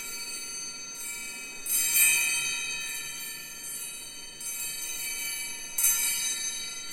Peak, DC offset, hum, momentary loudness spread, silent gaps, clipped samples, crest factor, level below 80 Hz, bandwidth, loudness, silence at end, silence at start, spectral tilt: -10 dBFS; under 0.1%; none; 15 LU; none; under 0.1%; 22 dB; -60 dBFS; 17 kHz; -28 LUFS; 0 s; 0 s; 2 dB/octave